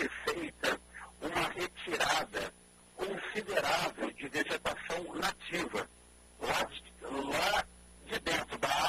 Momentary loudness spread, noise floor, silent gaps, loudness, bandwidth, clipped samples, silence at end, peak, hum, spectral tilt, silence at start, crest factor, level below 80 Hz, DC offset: 11 LU; -59 dBFS; none; -35 LUFS; 15.5 kHz; under 0.1%; 0 s; -16 dBFS; none; -2.5 dB/octave; 0 s; 20 dB; -60 dBFS; under 0.1%